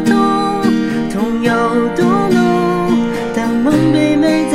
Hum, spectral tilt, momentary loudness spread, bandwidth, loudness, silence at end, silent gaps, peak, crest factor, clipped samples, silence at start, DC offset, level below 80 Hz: none; -6.5 dB/octave; 5 LU; 14.5 kHz; -14 LUFS; 0 s; none; -2 dBFS; 12 dB; under 0.1%; 0 s; under 0.1%; -40 dBFS